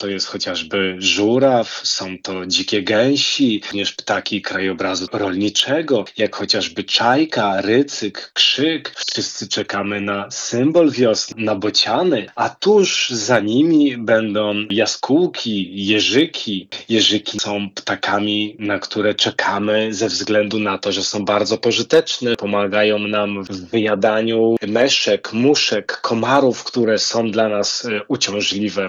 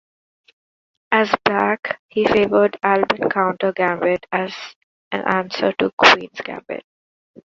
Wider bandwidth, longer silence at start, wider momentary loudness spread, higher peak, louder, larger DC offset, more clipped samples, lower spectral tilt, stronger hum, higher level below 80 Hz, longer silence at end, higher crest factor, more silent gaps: first, 9.8 kHz vs 7.8 kHz; second, 0 s vs 1.1 s; second, 8 LU vs 17 LU; about the same, -2 dBFS vs 0 dBFS; about the same, -17 LUFS vs -18 LUFS; neither; neither; about the same, -3.5 dB/octave vs -4.5 dB/octave; neither; second, -64 dBFS vs -58 dBFS; second, 0 s vs 0.65 s; about the same, 16 dB vs 20 dB; second, none vs 1.99-2.09 s, 4.76-5.11 s, 5.93-5.98 s